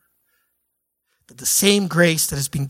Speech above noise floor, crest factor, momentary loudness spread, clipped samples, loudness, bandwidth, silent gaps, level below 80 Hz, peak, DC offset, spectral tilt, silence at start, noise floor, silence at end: 57 dB; 20 dB; 6 LU; under 0.1%; -17 LUFS; 17 kHz; none; -50 dBFS; -2 dBFS; under 0.1%; -3.5 dB/octave; 1.4 s; -75 dBFS; 0 s